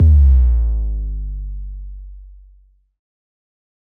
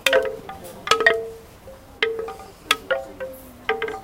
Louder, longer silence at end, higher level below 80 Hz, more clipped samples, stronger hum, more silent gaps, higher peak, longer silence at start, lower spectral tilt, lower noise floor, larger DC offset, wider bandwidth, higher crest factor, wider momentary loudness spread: first, -17 LUFS vs -22 LUFS; first, 1.7 s vs 0 s; first, -18 dBFS vs -52 dBFS; neither; neither; neither; second, -4 dBFS vs 0 dBFS; about the same, 0 s vs 0 s; first, -11.5 dB/octave vs -1.5 dB/octave; first, -51 dBFS vs -43 dBFS; neither; second, 1.1 kHz vs 17 kHz; second, 12 dB vs 24 dB; about the same, 23 LU vs 23 LU